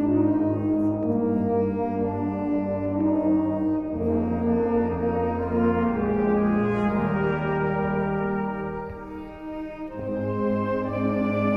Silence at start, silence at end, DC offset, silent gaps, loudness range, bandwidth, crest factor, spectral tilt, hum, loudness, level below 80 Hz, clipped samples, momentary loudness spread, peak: 0 s; 0 s; under 0.1%; none; 5 LU; 5.6 kHz; 12 dB; -10.5 dB/octave; none; -25 LUFS; -46 dBFS; under 0.1%; 10 LU; -12 dBFS